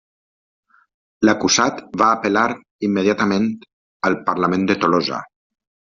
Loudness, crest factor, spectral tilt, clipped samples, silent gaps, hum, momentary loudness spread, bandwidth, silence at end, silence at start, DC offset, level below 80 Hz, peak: -18 LUFS; 18 dB; -3.5 dB/octave; under 0.1%; 2.71-2.79 s, 3.73-4.00 s; none; 8 LU; 7.6 kHz; 0.65 s; 1.2 s; under 0.1%; -58 dBFS; -2 dBFS